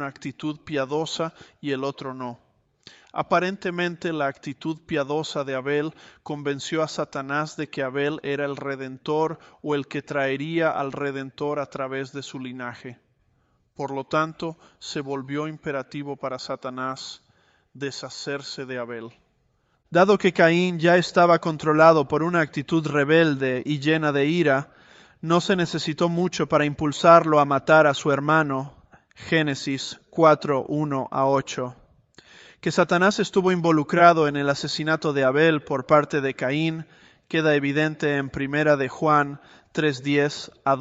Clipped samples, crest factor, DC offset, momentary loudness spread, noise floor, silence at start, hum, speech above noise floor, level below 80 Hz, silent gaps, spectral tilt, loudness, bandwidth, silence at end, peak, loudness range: under 0.1%; 22 dB; under 0.1%; 15 LU; -67 dBFS; 0 s; none; 45 dB; -62 dBFS; none; -5.5 dB/octave; -23 LUFS; 8.2 kHz; 0 s; -2 dBFS; 12 LU